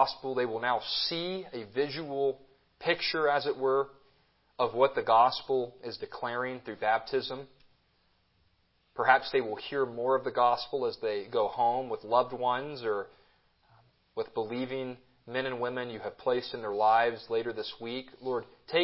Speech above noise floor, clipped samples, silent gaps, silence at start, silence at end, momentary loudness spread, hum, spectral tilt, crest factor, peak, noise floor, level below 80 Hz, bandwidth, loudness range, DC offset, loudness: 40 dB; under 0.1%; none; 0 s; 0 s; 13 LU; none; -8 dB/octave; 24 dB; -6 dBFS; -71 dBFS; -72 dBFS; 5.8 kHz; 7 LU; under 0.1%; -31 LUFS